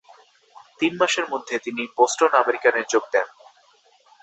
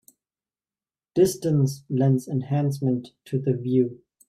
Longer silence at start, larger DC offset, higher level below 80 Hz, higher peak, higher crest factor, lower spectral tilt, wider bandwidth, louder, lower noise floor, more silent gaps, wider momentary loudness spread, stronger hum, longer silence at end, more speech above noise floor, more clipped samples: second, 0.8 s vs 1.15 s; neither; second, -72 dBFS vs -62 dBFS; first, -2 dBFS vs -8 dBFS; about the same, 22 dB vs 18 dB; second, -2 dB/octave vs -8 dB/octave; second, 8.2 kHz vs 15 kHz; first, -21 LUFS vs -24 LUFS; second, -58 dBFS vs under -90 dBFS; neither; about the same, 9 LU vs 7 LU; neither; first, 0.95 s vs 0.35 s; second, 37 dB vs over 67 dB; neither